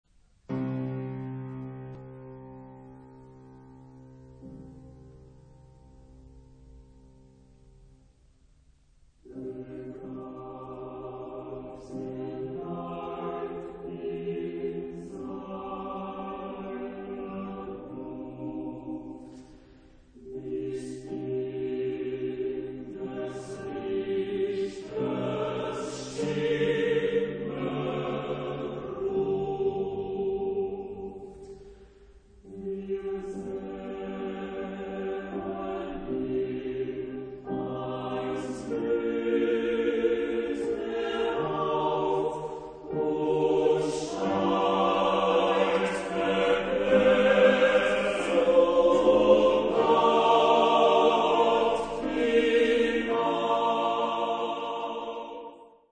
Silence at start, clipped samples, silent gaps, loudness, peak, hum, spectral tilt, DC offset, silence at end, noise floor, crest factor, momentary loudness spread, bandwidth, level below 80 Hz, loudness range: 0.5 s; under 0.1%; none; -28 LUFS; -8 dBFS; none; -5.5 dB/octave; under 0.1%; 0.25 s; -60 dBFS; 20 dB; 19 LU; 9.6 kHz; -56 dBFS; 17 LU